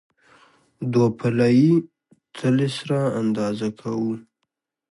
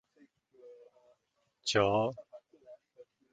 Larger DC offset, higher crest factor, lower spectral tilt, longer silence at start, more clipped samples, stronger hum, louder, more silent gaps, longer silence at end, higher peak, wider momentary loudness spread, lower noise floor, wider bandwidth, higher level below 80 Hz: neither; second, 16 dB vs 24 dB; first, -7.5 dB/octave vs -4 dB/octave; first, 0.8 s vs 0.65 s; neither; neither; first, -22 LUFS vs -31 LUFS; neither; first, 0.7 s vs 0.3 s; first, -6 dBFS vs -12 dBFS; second, 11 LU vs 28 LU; about the same, -78 dBFS vs -79 dBFS; first, 11.5 kHz vs 8.4 kHz; about the same, -64 dBFS vs -66 dBFS